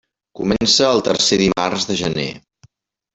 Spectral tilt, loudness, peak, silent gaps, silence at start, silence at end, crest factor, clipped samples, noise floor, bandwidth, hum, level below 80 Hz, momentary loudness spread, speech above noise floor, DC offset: -3.5 dB/octave; -16 LUFS; -2 dBFS; none; 0.35 s; 0.75 s; 16 dB; under 0.1%; -54 dBFS; 8.4 kHz; none; -46 dBFS; 11 LU; 37 dB; under 0.1%